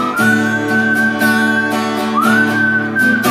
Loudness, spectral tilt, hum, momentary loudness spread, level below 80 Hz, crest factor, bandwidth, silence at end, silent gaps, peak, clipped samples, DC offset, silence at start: -13 LUFS; -4.5 dB/octave; none; 3 LU; -58 dBFS; 12 dB; 15.5 kHz; 0 s; none; 0 dBFS; under 0.1%; under 0.1%; 0 s